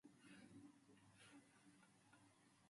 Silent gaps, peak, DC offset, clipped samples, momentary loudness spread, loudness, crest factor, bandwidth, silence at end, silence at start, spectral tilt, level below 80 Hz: none; -54 dBFS; under 0.1%; under 0.1%; 4 LU; -67 LUFS; 16 dB; 11.5 kHz; 0 s; 0.05 s; -4 dB/octave; under -90 dBFS